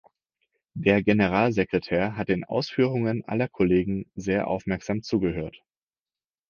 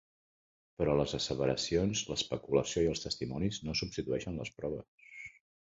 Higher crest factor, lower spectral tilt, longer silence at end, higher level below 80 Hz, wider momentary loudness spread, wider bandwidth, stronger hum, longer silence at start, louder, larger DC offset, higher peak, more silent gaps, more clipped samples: about the same, 22 dB vs 20 dB; first, -7.5 dB/octave vs -4.5 dB/octave; first, 0.95 s vs 0.45 s; about the same, -50 dBFS vs -54 dBFS; second, 8 LU vs 14 LU; second, 7 kHz vs 8 kHz; neither; about the same, 0.75 s vs 0.8 s; first, -25 LUFS vs -34 LUFS; neither; first, -4 dBFS vs -16 dBFS; second, none vs 4.88-4.98 s; neither